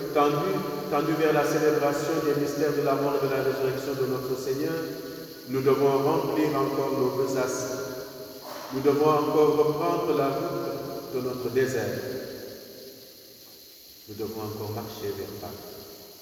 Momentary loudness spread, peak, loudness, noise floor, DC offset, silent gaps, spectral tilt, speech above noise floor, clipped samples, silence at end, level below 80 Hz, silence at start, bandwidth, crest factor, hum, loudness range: 19 LU; -8 dBFS; -26 LUFS; -49 dBFS; under 0.1%; none; -5.5 dB/octave; 23 dB; under 0.1%; 0 s; -62 dBFS; 0 s; over 20 kHz; 18 dB; none; 12 LU